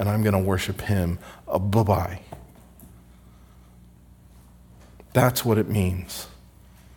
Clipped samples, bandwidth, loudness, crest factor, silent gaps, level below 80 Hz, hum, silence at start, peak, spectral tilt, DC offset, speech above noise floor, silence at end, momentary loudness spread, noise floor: under 0.1%; 18 kHz; -24 LUFS; 22 dB; none; -48 dBFS; 60 Hz at -50 dBFS; 0 s; -4 dBFS; -6 dB/octave; under 0.1%; 28 dB; 0.6 s; 16 LU; -51 dBFS